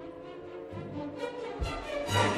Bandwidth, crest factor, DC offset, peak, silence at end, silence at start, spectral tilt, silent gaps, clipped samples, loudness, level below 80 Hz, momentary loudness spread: 15.5 kHz; 22 dB; under 0.1%; -12 dBFS; 0 s; 0 s; -4.5 dB/octave; none; under 0.1%; -36 LUFS; -46 dBFS; 13 LU